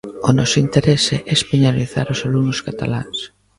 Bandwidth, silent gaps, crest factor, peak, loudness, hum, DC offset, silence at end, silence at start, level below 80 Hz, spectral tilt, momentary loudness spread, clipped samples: 11.5 kHz; none; 16 dB; 0 dBFS; -17 LUFS; none; under 0.1%; 0.3 s; 0.05 s; -44 dBFS; -5 dB/octave; 8 LU; under 0.1%